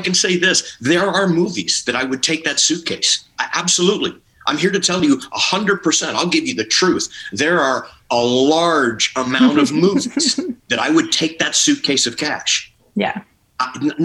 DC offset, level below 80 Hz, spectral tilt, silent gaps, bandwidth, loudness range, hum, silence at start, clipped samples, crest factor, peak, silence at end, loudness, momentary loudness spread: under 0.1%; -58 dBFS; -2.5 dB/octave; none; 12.5 kHz; 1 LU; none; 0 s; under 0.1%; 14 dB; -2 dBFS; 0 s; -16 LUFS; 7 LU